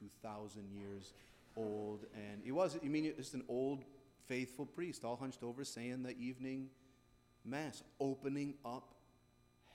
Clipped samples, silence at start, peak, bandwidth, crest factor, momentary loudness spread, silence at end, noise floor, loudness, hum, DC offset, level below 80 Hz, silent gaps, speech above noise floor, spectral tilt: under 0.1%; 0 s; -24 dBFS; 16 kHz; 20 dB; 12 LU; 0 s; -72 dBFS; -45 LUFS; none; under 0.1%; -76 dBFS; none; 28 dB; -5.5 dB/octave